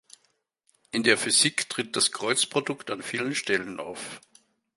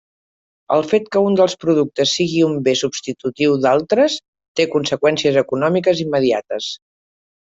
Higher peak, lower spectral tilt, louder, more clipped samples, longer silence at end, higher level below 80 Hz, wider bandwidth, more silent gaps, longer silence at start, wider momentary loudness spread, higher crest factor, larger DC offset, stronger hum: about the same, -4 dBFS vs -2 dBFS; second, -1.5 dB/octave vs -5 dB/octave; second, -25 LUFS vs -17 LUFS; neither; second, 0.6 s vs 0.75 s; second, -72 dBFS vs -60 dBFS; first, 12 kHz vs 8 kHz; second, none vs 4.28-4.33 s, 4.48-4.55 s; first, 0.95 s vs 0.7 s; first, 16 LU vs 10 LU; first, 24 dB vs 14 dB; neither; neither